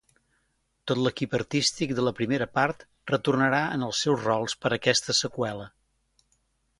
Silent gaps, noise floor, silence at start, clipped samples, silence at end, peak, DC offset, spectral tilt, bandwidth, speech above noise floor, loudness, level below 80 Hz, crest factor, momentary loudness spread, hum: none; -73 dBFS; 0.85 s; under 0.1%; 1.1 s; -6 dBFS; under 0.1%; -4 dB/octave; 11.5 kHz; 47 dB; -26 LUFS; -62 dBFS; 22 dB; 8 LU; none